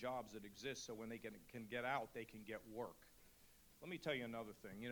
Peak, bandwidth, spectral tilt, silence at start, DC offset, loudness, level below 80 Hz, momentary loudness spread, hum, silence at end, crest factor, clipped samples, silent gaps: -30 dBFS; over 20 kHz; -4.5 dB/octave; 0 s; under 0.1%; -50 LUFS; -76 dBFS; 22 LU; none; 0 s; 22 dB; under 0.1%; none